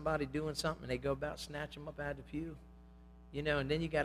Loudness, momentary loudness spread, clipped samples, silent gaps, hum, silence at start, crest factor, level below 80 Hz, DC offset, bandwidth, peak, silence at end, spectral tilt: -39 LUFS; 13 LU; under 0.1%; none; none; 0 s; 20 dB; -54 dBFS; under 0.1%; 15.5 kHz; -20 dBFS; 0 s; -5.5 dB/octave